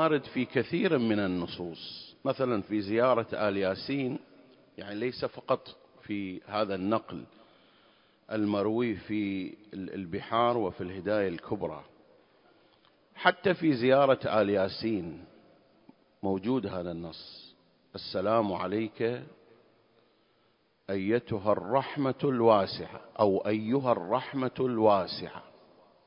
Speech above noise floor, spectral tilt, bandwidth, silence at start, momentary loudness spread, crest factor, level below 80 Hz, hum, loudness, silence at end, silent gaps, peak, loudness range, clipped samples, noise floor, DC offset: 40 dB; -10 dB/octave; 5.4 kHz; 0 s; 16 LU; 24 dB; -62 dBFS; none; -30 LUFS; 0.65 s; none; -8 dBFS; 6 LU; under 0.1%; -69 dBFS; under 0.1%